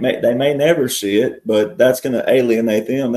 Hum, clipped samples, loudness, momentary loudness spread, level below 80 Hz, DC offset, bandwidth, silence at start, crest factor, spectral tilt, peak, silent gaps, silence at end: none; under 0.1%; -16 LUFS; 3 LU; -58 dBFS; under 0.1%; 13.5 kHz; 0 s; 14 dB; -5 dB/octave; 0 dBFS; none; 0 s